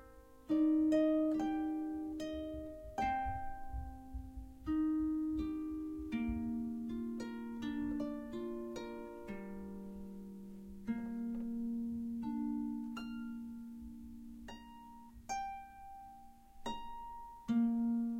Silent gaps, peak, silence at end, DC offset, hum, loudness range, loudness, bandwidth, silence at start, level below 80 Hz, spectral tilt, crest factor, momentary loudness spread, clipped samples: none; -22 dBFS; 0 s; under 0.1%; none; 11 LU; -39 LUFS; 13.5 kHz; 0 s; -56 dBFS; -6.5 dB/octave; 16 dB; 18 LU; under 0.1%